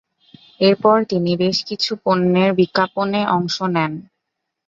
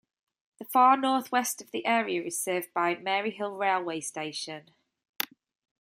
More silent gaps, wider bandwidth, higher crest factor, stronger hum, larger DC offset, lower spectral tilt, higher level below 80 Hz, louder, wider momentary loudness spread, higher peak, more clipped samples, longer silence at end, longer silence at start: neither; second, 7.6 kHz vs 16 kHz; second, 16 dB vs 24 dB; neither; neither; first, -6 dB/octave vs -2.5 dB/octave; first, -60 dBFS vs -84 dBFS; first, -18 LUFS vs -28 LUFS; second, 6 LU vs 13 LU; about the same, -2 dBFS vs -4 dBFS; neither; second, 0.65 s vs 1.2 s; about the same, 0.6 s vs 0.6 s